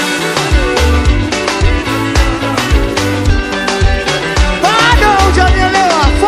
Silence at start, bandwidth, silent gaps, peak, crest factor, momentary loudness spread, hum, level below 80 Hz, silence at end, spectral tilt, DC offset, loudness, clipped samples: 0 s; 15 kHz; none; 0 dBFS; 10 dB; 6 LU; none; -14 dBFS; 0 s; -4.5 dB/octave; under 0.1%; -11 LUFS; 0.2%